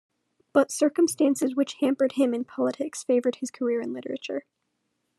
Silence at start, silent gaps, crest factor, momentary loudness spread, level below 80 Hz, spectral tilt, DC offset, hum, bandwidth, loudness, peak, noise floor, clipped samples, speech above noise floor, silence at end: 0.55 s; none; 18 dB; 10 LU; -84 dBFS; -3.5 dB/octave; under 0.1%; none; 13 kHz; -26 LUFS; -8 dBFS; -77 dBFS; under 0.1%; 52 dB; 0.8 s